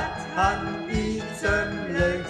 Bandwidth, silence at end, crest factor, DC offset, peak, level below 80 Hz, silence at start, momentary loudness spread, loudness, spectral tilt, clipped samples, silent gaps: 13 kHz; 0 s; 16 dB; under 0.1%; -10 dBFS; -38 dBFS; 0 s; 5 LU; -26 LUFS; -5.5 dB/octave; under 0.1%; none